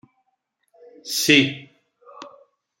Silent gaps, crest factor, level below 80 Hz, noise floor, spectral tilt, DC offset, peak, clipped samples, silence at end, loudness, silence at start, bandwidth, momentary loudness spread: none; 24 dB; -68 dBFS; -73 dBFS; -3 dB/octave; under 0.1%; -2 dBFS; under 0.1%; 0.5 s; -18 LUFS; 1.05 s; 16 kHz; 25 LU